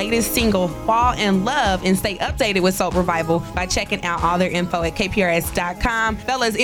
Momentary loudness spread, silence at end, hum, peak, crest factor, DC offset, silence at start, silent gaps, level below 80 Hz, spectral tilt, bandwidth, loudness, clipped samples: 4 LU; 0 s; none; -6 dBFS; 14 dB; under 0.1%; 0 s; none; -34 dBFS; -4.5 dB/octave; over 20 kHz; -19 LUFS; under 0.1%